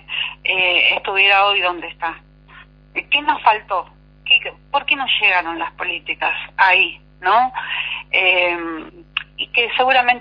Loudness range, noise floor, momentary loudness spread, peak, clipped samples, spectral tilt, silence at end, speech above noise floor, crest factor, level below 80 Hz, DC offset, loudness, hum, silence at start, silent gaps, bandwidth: 2 LU; -44 dBFS; 14 LU; 0 dBFS; under 0.1%; -4 dB/octave; 0 s; 27 dB; 18 dB; -52 dBFS; under 0.1%; -16 LUFS; 50 Hz at -50 dBFS; 0.1 s; none; 5.2 kHz